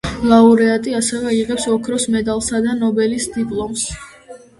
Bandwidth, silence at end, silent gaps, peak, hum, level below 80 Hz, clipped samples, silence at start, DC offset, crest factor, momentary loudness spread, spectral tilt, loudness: 11.5 kHz; 0.2 s; none; 0 dBFS; none; -42 dBFS; under 0.1%; 0.05 s; under 0.1%; 16 dB; 11 LU; -4 dB/octave; -16 LUFS